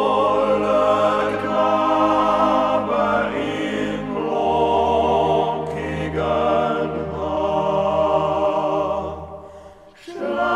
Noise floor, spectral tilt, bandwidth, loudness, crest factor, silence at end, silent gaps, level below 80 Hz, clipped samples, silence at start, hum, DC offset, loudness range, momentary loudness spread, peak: -43 dBFS; -6.5 dB/octave; 11.5 kHz; -20 LUFS; 16 dB; 0 s; none; -44 dBFS; under 0.1%; 0 s; none; under 0.1%; 4 LU; 8 LU; -4 dBFS